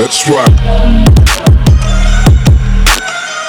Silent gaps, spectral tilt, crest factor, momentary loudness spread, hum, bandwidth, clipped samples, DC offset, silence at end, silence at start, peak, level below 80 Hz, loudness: none; -5 dB/octave; 6 dB; 4 LU; none; 18 kHz; 0.2%; under 0.1%; 0 s; 0 s; 0 dBFS; -10 dBFS; -8 LUFS